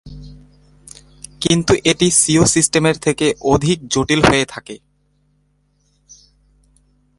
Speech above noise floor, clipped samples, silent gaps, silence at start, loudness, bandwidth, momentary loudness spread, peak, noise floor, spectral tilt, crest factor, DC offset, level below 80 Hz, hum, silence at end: 46 dB; under 0.1%; none; 0.05 s; -14 LUFS; 11.5 kHz; 21 LU; 0 dBFS; -61 dBFS; -3.5 dB/octave; 18 dB; under 0.1%; -40 dBFS; 50 Hz at -40 dBFS; 2.45 s